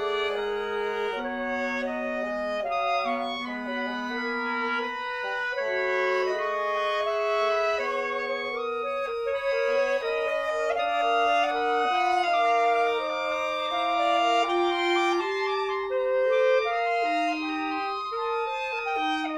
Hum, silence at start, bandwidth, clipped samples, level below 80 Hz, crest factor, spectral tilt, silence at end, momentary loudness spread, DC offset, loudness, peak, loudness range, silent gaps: none; 0 s; 12 kHz; under 0.1%; -62 dBFS; 14 dB; -2.5 dB/octave; 0 s; 7 LU; under 0.1%; -26 LUFS; -12 dBFS; 4 LU; none